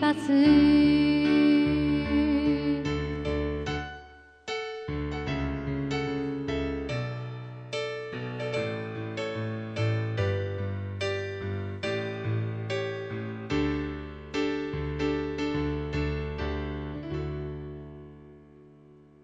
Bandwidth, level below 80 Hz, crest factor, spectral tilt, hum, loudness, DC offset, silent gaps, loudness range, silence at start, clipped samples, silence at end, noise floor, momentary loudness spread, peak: 9 kHz; -42 dBFS; 18 dB; -7 dB/octave; none; -29 LUFS; under 0.1%; none; 8 LU; 0 s; under 0.1%; 0.55 s; -54 dBFS; 14 LU; -10 dBFS